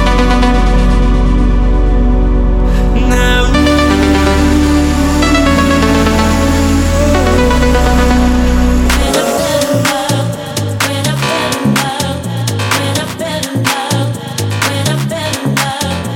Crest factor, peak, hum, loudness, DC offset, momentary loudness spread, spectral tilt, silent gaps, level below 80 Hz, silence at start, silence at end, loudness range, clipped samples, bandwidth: 10 dB; 0 dBFS; none; -12 LUFS; under 0.1%; 6 LU; -5 dB/octave; none; -14 dBFS; 0 s; 0 s; 5 LU; under 0.1%; 17 kHz